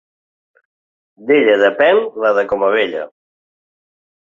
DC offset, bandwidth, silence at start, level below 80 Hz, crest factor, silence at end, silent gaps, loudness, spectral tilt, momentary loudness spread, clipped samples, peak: under 0.1%; 7.2 kHz; 1.2 s; -60 dBFS; 16 dB; 1.25 s; none; -14 LUFS; -5.5 dB/octave; 15 LU; under 0.1%; -2 dBFS